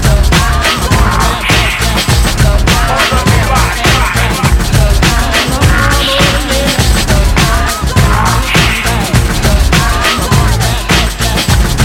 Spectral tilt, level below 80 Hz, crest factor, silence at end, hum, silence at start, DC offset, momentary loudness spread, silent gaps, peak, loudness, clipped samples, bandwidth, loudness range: -4 dB/octave; -14 dBFS; 8 dB; 0 s; none; 0 s; under 0.1%; 2 LU; none; 0 dBFS; -10 LUFS; 0.4%; 17 kHz; 1 LU